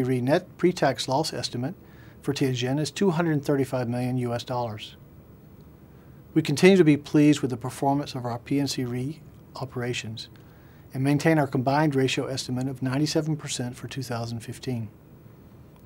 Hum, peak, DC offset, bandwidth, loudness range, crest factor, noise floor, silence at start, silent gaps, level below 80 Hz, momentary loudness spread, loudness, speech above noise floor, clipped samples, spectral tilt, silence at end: none; -2 dBFS; under 0.1%; 16 kHz; 7 LU; 22 dB; -49 dBFS; 0 s; none; -58 dBFS; 15 LU; -25 LUFS; 24 dB; under 0.1%; -6 dB/octave; 0.25 s